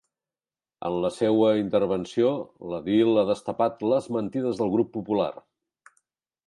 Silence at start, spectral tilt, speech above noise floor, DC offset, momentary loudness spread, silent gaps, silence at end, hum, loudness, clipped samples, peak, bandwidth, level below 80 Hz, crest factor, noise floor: 0.8 s; -7 dB/octave; over 66 dB; under 0.1%; 10 LU; none; 1.15 s; none; -25 LUFS; under 0.1%; -8 dBFS; 11.5 kHz; -62 dBFS; 16 dB; under -90 dBFS